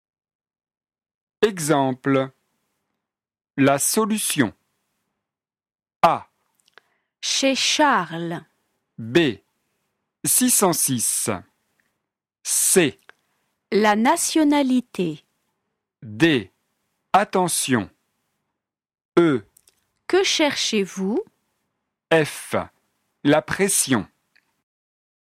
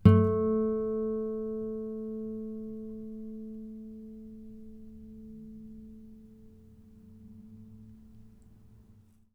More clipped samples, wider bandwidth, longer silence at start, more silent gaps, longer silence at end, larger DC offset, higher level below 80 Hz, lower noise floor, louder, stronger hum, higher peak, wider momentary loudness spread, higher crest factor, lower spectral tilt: neither; first, 16.5 kHz vs 4.4 kHz; first, 1.4 s vs 0 s; first, 5.96-6.00 s, 19.05-19.12 s vs none; first, 1.25 s vs 0.45 s; neither; second, -62 dBFS vs -54 dBFS; first, -84 dBFS vs -59 dBFS; first, -20 LUFS vs -32 LUFS; neither; first, -2 dBFS vs -6 dBFS; second, 12 LU vs 25 LU; second, 20 dB vs 26 dB; second, -3 dB/octave vs -11 dB/octave